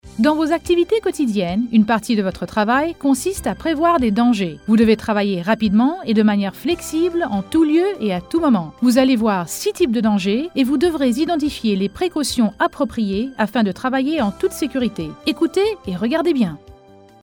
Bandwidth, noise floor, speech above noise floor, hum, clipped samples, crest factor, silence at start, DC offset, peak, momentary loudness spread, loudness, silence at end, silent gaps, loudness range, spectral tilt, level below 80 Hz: 18.5 kHz; -46 dBFS; 28 dB; none; under 0.1%; 16 dB; 0.05 s; under 0.1%; -2 dBFS; 6 LU; -18 LUFS; 0.5 s; none; 3 LU; -5.5 dB/octave; -46 dBFS